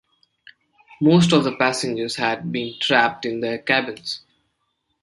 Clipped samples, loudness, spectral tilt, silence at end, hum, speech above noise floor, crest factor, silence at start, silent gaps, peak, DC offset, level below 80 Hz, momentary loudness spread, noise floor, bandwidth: under 0.1%; -20 LUFS; -5 dB/octave; 0.85 s; none; 53 dB; 20 dB; 0.9 s; none; -2 dBFS; under 0.1%; -60 dBFS; 12 LU; -72 dBFS; 11.5 kHz